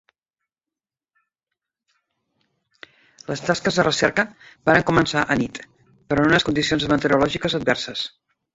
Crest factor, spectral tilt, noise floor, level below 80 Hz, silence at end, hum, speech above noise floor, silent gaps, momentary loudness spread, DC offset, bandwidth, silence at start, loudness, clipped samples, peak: 22 dB; -4.5 dB/octave; -90 dBFS; -50 dBFS; 0.45 s; none; 70 dB; none; 12 LU; under 0.1%; 8 kHz; 3.3 s; -20 LUFS; under 0.1%; -2 dBFS